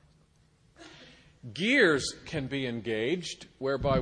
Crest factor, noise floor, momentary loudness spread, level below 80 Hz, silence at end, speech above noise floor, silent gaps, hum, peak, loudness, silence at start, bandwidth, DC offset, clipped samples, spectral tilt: 22 dB; -64 dBFS; 22 LU; -52 dBFS; 0 s; 35 dB; none; none; -10 dBFS; -29 LUFS; 0.8 s; 10 kHz; under 0.1%; under 0.1%; -4.5 dB/octave